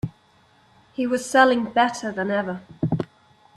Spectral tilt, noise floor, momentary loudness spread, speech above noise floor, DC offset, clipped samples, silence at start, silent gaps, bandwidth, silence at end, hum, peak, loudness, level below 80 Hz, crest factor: -5 dB/octave; -58 dBFS; 16 LU; 37 dB; under 0.1%; under 0.1%; 0.05 s; none; 13 kHz; 0.5 s; none; -4 dBFS; -22 LUFS; -56 dBFS; 20 dB